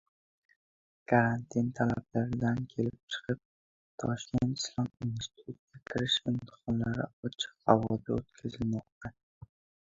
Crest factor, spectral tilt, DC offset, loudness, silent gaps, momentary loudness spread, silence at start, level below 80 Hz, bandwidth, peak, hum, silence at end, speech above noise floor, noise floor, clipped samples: 28 dB; -5.5 dB/octave; under 0.1%; -33 LUFS; 3.03-3.08 s, 3.45-3.98 s, 5.59-5.67 s, 7.13-7.23 s, 8.92-9.01 s; 15 LU; 1.1 s; -58 dBFS; 7.8 kHz; -6 dBFS; none; 0.8 s; over 58 dB; under -90 dBFS; under 0.1%